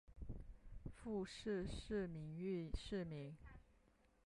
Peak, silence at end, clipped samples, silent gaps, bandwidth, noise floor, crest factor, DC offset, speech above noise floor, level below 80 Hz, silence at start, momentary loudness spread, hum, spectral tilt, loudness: -32 dBFS; 0.55 s; under 0.1%; none; 11.5 kHz; -75 dBFS; 16 dB; under 0.1%; 28 dB; -58 dBFS; 0.1 s; 14 LU; none; -6.5 dB/octave; -49 LUFS